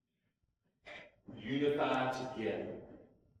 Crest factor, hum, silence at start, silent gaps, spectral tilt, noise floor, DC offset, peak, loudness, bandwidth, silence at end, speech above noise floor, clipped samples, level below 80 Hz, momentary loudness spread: 18 dB; none; 0.85 s; none; -6 dB/octave; -82 dBFS; under 0.1%; -22 dBFS; -36 LUFS; 12 kHz; 0.35 s; 47 dB; under 0.1%; -72 dBFS; 20 LU